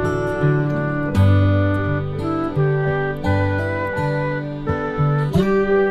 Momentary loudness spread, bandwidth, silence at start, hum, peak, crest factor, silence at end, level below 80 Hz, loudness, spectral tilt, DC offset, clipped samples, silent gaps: 7 LU; 8.6 kHz; 0 s; none; -6 dBFS; 12 dB; 0 s; -38 dBFS; -19 LUFS; -8.5 dB/octave; 0.3%; under 0.1%; none